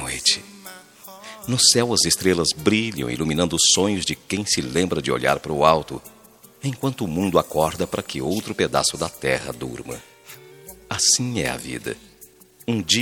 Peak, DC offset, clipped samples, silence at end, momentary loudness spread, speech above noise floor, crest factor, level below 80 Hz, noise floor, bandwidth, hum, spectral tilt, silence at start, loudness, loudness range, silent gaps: 0 dBFS; under 0.1%; under 0.1%; 0 s; 19 LU; 28 dB; 22 dB; -48 dBFS; -49 dBFS; 19 kHz; none; -3 dB/octave; 0 s; -20 LUFS; 6 LU; none